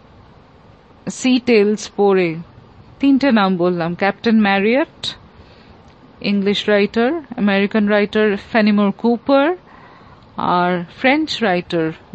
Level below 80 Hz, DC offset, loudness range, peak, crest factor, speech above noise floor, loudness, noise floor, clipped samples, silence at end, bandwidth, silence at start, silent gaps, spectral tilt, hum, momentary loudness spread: -54 dBFS; under 0.1%; 2 LU; -2 dBFS; 16 dB; 30 dB; -16 LUFS; -46 dBFS; under 0.1%; 0.2 s; 8.6 kHz; 1.05 s; none; -6 dB/octave; none; 9 LU